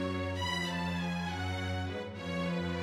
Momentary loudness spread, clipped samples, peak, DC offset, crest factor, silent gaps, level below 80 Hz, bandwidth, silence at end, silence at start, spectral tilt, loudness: 4 LU; under 0.1%; -22 dBFS; under 0.1%; 12 dB; none; -56 dBFS; 13.5 kHz; 0 s; 0 s; -5.5 dB/octave; -35 LUFS